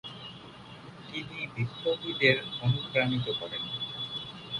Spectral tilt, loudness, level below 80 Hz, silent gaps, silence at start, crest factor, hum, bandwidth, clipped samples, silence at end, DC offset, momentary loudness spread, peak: -6 dB/octave; -30 LUFS; -62 dBFS; none; 0.05 s; 24 dB; none; 11 kHz; under 0.1%; 0 s; under 0.1%; 21 LU; -8 dBFS